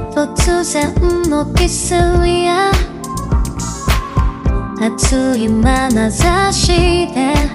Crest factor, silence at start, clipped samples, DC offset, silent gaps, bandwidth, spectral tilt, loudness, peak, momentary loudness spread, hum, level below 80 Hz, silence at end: 14 dB; 0 s; under 0.1%; under 0.1%; none; 16 kHz; -5 dB/octave; -14 LUFS; 0 dBFS; 6 LU; none; -20 dBFS; 0 s